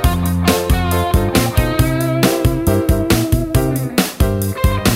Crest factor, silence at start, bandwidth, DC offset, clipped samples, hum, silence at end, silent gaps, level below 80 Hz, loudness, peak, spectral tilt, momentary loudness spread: 14 dB; 0 s; 16.5 kHz; 0.2%; under 0.1%; none; 0 s; none; -22 dBFS; -16 LUFS; 0 dBFS; -5.5 dB/octave; 2 LU